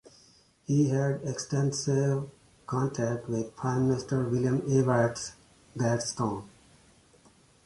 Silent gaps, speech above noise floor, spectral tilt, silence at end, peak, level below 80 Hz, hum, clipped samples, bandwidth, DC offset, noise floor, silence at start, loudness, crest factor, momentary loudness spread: none; 33 dB; -6 dB/octave; 1.15 s; -10 dBFS; -60 dBFS; none; under 0.1%; 11.5 kHz; under 0.1%; -61 dBFS; 0.7 s; -29 LUFS; 18 dB; 13 LU